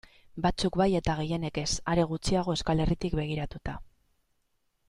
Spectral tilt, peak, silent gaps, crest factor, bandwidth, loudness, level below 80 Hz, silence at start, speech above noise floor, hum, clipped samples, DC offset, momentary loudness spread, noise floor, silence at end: -5.5 dB/octave; -12 dBFS; none; 18 dB; 11.5 kHz; -29 LUFS; -42 dBFS; 0.35 s; 46 dB; none; under 0.1%; under 0.1%; 12 LU; -74 dBFS; 1 s